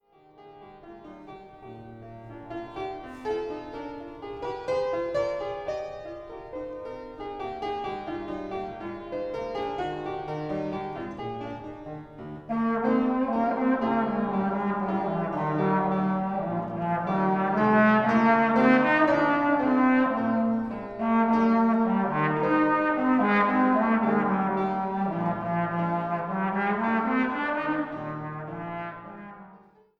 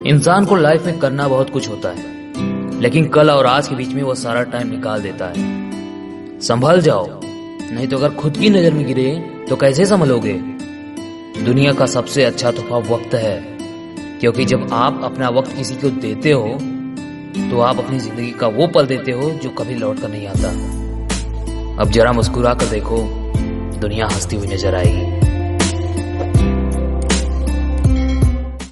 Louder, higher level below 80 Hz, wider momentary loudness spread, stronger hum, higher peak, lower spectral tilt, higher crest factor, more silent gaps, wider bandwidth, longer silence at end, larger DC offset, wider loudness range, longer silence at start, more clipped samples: second, -26 LUFS vs -17 LUFS; second, -56 dBFS vs -26 dBFS; first, 18 LU vs 13 LU; neither; second, -8 dBFS vs 0 dBFS; first, -8.5 dB/octave vs -6 dB/octave; about the same, 18 dB vs 16 dB; neither; second, 7 kHz vs 11.5 kHz; first, 0.4 s vs 0 s; neither; first, 13 LU vs 3 LU; first, 0.4 s vs 0 s; neither